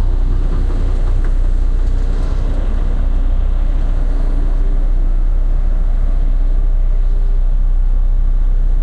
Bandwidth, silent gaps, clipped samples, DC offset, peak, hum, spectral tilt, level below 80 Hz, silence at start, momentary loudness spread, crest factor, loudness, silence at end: 2.2 kHz; none; under 0.1%; under 0.1%; -4 dBFS; none; -8 dB/octave; -12 dBFS; 0 s; 1 LU; 8 dB; -20 LUFS; 0 s